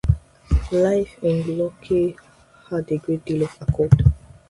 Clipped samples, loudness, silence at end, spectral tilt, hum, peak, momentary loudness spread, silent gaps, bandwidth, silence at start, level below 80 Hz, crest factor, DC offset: under 0.1%; -22 LUFS; 0.35 s; -9 dB/octave; none; 0 dBFS; 9 LU; none; 11.5 kHz; 0.05 s; -30 dBFS; 20 dB; under 0.1%